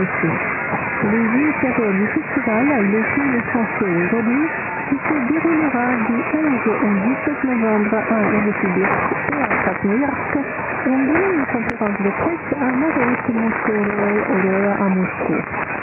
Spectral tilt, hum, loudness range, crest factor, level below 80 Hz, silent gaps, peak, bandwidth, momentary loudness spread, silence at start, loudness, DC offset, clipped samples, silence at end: -11 dB/octave; none; 1 LU; 16 dB; -50 dBFS; none; -2 dBFS; 3.2 kHz; 4 LU; 0 s; -18 LUFS; under 0.1%; under 0.1%; 0 s